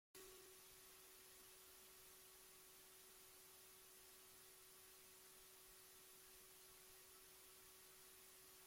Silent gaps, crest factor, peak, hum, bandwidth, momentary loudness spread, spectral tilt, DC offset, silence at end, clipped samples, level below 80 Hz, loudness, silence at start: none; 16 dB; -50 dBFS; none; 16.5 kHz; 1 LU; -1 dB/octave; under 0.1%; 0 s; under 0.1%; -86 dBFS; -63 LUFS; 0.15 s